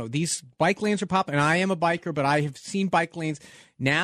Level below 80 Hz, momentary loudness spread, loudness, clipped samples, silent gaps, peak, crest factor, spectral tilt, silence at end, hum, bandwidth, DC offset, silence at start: -62 dBFS; 7 LU; -25 LUFS; under 0.1%; none; -10 dBFS; 16 dB; -5 dB/octave; 0 s; none; 14 kHz; under 0.1%; 0 s